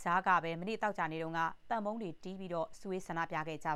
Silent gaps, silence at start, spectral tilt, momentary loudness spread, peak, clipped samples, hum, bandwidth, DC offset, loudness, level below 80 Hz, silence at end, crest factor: none; 0 s; -5.5 dB/octave; 11 LU; -16 dBFS; under 0.1%; none; 14 kHz; under 0.1%; -37 LUFS; -66 dBFS; 0 s; 20 dB